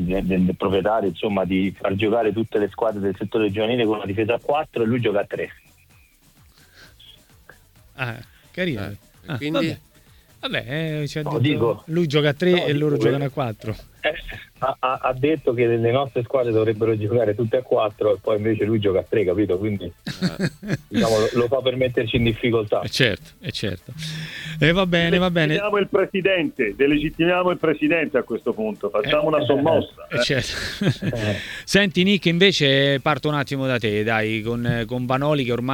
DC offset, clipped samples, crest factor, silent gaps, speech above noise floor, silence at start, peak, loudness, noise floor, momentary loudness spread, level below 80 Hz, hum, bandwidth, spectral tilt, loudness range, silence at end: under 0.1%; under 0.1%; 22 dB; none; 33 dB; 0 s; 0 dBFS; -21 LUFS; -54 dBFS; 10 LU; -46 dBFS; none; 18.5 kHz; -6 dB/octave; 8 LU; 0 s